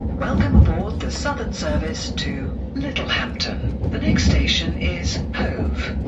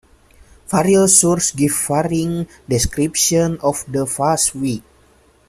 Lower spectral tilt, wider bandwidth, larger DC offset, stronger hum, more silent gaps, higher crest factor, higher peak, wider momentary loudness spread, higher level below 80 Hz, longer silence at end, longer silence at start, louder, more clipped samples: first, -5.5 dB/octave vs -4 dB/octave; second, 8.2 kHz vs 15.5 kHz; neither; neither; neither; about the same, 20 dB vs 18 dB; about the same, 0 dBFS vs 0 dBFS; second, 8 LU vs 12 LU; first, -24 dBFS vs -40 dBFS; second, 0 s vs 0.7 s; second, 0 s vs 0.7 s; second, -21 LUFS vs -16 LUFS; neither